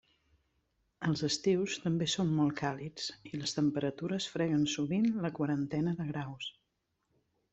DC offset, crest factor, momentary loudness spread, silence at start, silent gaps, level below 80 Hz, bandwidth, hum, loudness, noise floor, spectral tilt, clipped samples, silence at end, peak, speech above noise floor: under 0.1%; 18 dB; 8 LU; 1 s; none; -68 dBFS; 8.2 kHz; none; -33 LUFS; -81 dBFS; -5.5 dB/octave; under 0.1%; 1 s; -16 dBFS; 49 dB